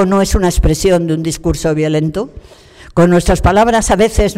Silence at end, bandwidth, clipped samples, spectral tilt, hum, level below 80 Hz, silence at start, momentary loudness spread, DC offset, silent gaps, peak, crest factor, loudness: 0 s; 16 kHz; under 0.1%; -5.5 dB/octave; none; -22 dBFS; 0 s; 8 LU; under 0.1%; none; -2 dBFS; 10 dB; -13 LUFS